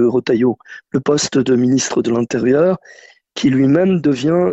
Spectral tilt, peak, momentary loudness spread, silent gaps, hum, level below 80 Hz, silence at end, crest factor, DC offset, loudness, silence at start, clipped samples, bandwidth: -5.5 dB/octave; -2 dBFS; 8 LU; none; none; -52 dBFS; 0 s; 12 dB; under 0.1%; -15 LUFS; 0 s; under 0.1%; 8.4 kHz